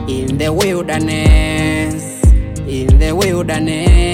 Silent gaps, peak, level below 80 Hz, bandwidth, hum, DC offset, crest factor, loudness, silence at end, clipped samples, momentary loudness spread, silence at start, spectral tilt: none; 0 dBFS; -14 dBFS; 15.5 kHz; none; under 0.1%; 12 dB; -14 LUFS; 0 s; under 0.1%; 6 LU; 0 s; -5.5 dB/octave